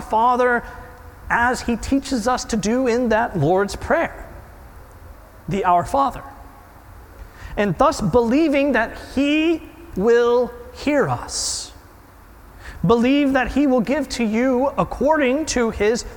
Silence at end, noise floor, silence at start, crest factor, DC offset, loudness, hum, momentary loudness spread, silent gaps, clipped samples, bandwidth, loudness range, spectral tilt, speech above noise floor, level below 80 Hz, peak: 0 s; -45 dBFS; 0 s; 16 dB; under 0.1%; -19 LUFS; none; 11 LU; none; under 0.1%; 18 kHz; 4 LU; -5 dB/octave; 26 dB; -40 dBFS; -4 dBFS